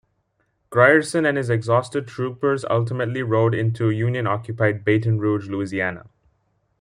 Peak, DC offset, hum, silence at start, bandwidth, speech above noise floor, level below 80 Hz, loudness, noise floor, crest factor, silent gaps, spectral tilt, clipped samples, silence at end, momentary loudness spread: -2 dBFS; under 0.1%; none; 0.7 s; 11 kHz; 49 dB; -60 dBFS; -21 LUFS; -69 dBFS; 20 dB; none; -7 dB/octave; under 0.1%; 0.8 s; 9 LU